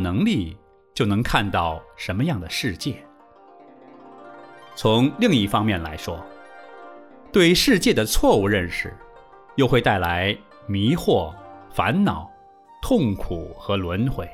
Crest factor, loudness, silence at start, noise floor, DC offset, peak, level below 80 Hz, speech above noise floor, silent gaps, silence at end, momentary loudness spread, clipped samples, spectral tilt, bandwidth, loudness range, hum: 20 dB; -21 LUFS; 0 s; -49 dBFS; under 0.1%; -2 dBFS; -38 dBFS; 29 dB; none; 0 s; 18 LU; under 0.1%; -5 dB/octave; 16 kHz; 6 LU; none